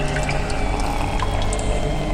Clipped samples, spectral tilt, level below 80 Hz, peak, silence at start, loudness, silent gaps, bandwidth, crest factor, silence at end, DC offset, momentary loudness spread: under 0.1%; -5 dB/octave; -24 dBFS; -6 dBFS; 0 s; -23 LUFS; none; 14.5 kHz; 14 dB; 0 s; under 0.1%; 1 LU